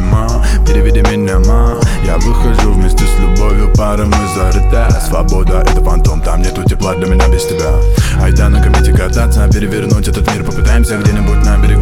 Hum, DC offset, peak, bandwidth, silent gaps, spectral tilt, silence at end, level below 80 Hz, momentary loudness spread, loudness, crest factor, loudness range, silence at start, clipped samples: none; under 0.1%; 0 dBFS; 15 kHz; none; -6 dB/octave; 0 s; -10 dBFS; 3 LU; -12 LUFS; 8 dB; 1 LU; 0 s; under 0.1%